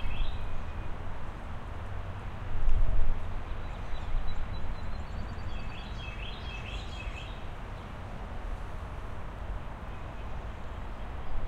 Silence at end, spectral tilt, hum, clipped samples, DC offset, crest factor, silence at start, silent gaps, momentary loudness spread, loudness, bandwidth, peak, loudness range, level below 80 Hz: 0 s; -6.5 dB/octave; none; under 0.1%; under 0.1%; 18 dB; 0 s; none; 6 LU; -40 LUFS; 4.9 kHz; -10 dBFS; 4 LU; -34 dBFS